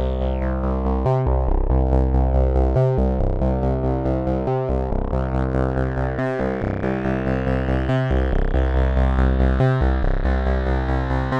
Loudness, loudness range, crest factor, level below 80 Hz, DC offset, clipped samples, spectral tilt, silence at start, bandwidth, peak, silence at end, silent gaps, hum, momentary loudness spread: -21 LUFS; 2 LU; 14 dB; -22 dBFS; under 0.1%; under 0.1%; -9.5 dB/octave; 0 s; 5.4 kHz; -4 dBFS; 0 s; none; none; 4 LU